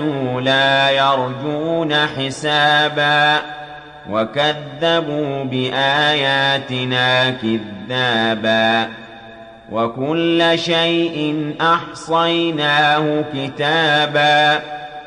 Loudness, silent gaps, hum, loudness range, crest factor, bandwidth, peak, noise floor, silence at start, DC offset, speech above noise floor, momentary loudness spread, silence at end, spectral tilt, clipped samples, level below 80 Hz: -16 LUFS; none; none; 3 LU; 14 dB; 10.5 kHz; -2 dBFS; -38 dBFS; 0 s; under 0.1%; 21 dB; 9 LU; 0 s; -5 dB/octave; under 0.1%; -56 dBFS